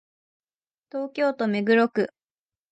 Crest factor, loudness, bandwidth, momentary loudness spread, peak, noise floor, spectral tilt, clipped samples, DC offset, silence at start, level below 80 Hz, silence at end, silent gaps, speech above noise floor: 18 dB; -24 LUFS; 8.8 kHz; 12 LU; -8 dBFS; under -90 dBFS; -7 dB/octave; under 0.1%; under 0.1%; 0.95 s; -78 dBFS; 0.65 s; none; over 67 dB